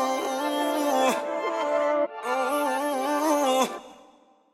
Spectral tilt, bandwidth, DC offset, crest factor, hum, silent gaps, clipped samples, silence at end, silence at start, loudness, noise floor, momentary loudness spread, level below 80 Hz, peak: -2 dB/octave; 16.5 kHz; under 0.1%; 16 dB; none; none; under 0.1%; 0.6 s; 0 s; -25 LUFS; -57 dBFS; 5 LU; -74 dBFS; -10 dBFS